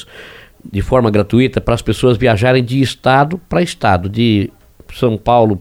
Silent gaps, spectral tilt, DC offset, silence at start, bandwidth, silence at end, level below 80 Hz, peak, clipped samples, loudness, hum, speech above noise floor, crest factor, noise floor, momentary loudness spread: none; -6.5 dB/octave; under 0.1%; 0 s; 16 kHz; 0 s; -34 dBFS; 0 dBFS; under 0.1%; -14 LUFS; none; 24 dB; 14 dB; -37 dBFS; 6 LU